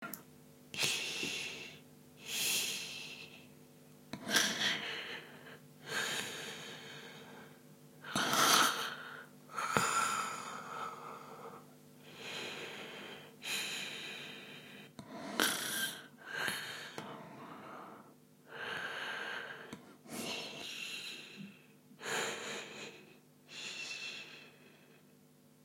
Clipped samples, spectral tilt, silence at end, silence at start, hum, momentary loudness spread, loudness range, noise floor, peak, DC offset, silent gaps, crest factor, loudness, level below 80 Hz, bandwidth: under 0.1%; -1 dB/octave; 0.15 s; 0 s; none; 20 LU; 10 LU; -64 dBFS; -10 dBFS; under 0.1%; none; 32 dB; -37 LUFS; -82 dBFS; 16.5 kHz